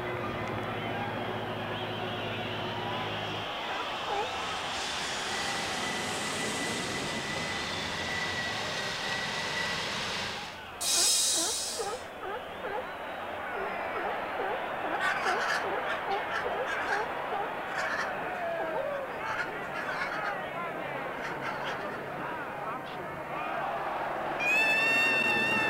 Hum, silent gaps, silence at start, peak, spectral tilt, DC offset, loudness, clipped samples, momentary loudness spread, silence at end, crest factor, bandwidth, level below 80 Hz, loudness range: none; none; 0 s; -16 dBFS; -2 dB/octave; under 0.1%; -31 LUFS; under 0.1%; 11 LU; 0 s; 18 dB; 16 kHz; -60 dBFS; 6 LU